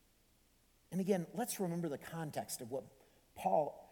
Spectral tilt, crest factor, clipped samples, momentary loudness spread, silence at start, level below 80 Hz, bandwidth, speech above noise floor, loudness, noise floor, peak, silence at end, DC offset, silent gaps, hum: -5.5 dB/octave; 20 dB; under 0.1%; 9 LU; 0.9 s; -74 dBFS; 19 kHz; 33 dB; -40 LUFS; -71 dBFS; -20 dBFS; 0.05 s; under 0.1%; none; none